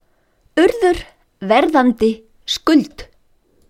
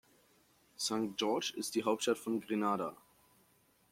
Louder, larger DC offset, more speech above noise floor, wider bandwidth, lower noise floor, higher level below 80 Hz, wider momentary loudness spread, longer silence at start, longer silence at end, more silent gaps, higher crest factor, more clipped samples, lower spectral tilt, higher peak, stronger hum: first, -16 LUFS vs -36 LUFS; neither; first, 43 dB vs 35 dB; about the same, 15.5 kHz vs 16.5 kHz; second, -58 dBFS vs -71 dBFS; first, -44 dBFS vs -80 dBFS; first, 13 LU vs 4 LU; second, 0.55 s vs 0.8 s; second, 0.65 s vs 0.95 s; neither; about the same, 16 dB vs 20 dB; neither; about the same, -4.5 dB/octave vs -3.5 dB/octave; first, 0 dBFS vs -18 dBFS; neither